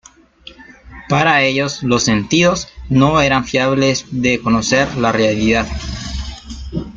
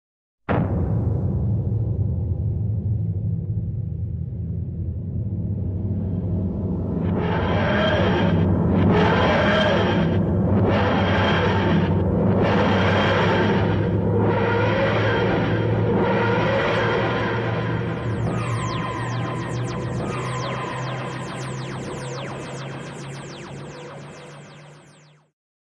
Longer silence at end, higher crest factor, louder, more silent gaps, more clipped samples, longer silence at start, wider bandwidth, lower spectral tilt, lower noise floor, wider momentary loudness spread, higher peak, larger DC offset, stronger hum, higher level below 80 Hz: second, 0 s vs 0.8 s; about the same, 14 dB vs 14 dB; first, -15 LUFS vs -22 LUFS; neither; neither; about the same, 0.45 s vs 0.5 s; second, 8.8 kHz vs 9.8 kHz; second, -4.5 dB/octave vs -7 dB/octave; second, -42 dBFS vs -51 dBFS; about the same, 13 LU vs 12 LU; first, -2 dBFS vs -8 dBFS; neither; neither; about the same, -34 dBFS vs -38 dBFS